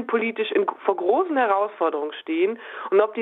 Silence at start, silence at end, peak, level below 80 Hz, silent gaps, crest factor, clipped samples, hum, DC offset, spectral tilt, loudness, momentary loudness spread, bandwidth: 0 s; 0 s; -4 dBFS; -78 dBFS; none; 18 dB; under 0.1%; none; under 0.1%; -7 dB/octave; -23 LUFS; 5 LU; 4 kHz